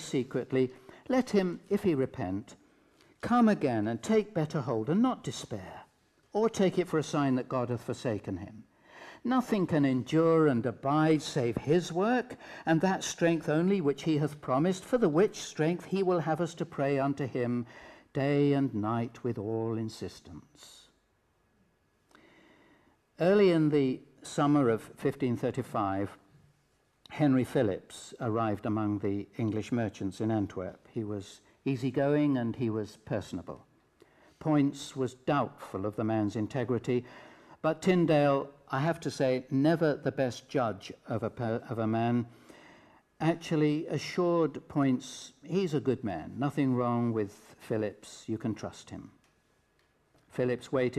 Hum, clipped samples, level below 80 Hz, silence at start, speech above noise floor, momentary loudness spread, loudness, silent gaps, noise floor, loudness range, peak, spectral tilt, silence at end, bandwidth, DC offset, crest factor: none; under 0.1%; -68 dBFS; 0 s; 42 dB; 13 LU; -30 LUFS; none; -72 dBFS; 5 LU; -14 dBFS; -6.5 dB/octave; 0 s; 13.5 kHz; under 0.1%; 16 dB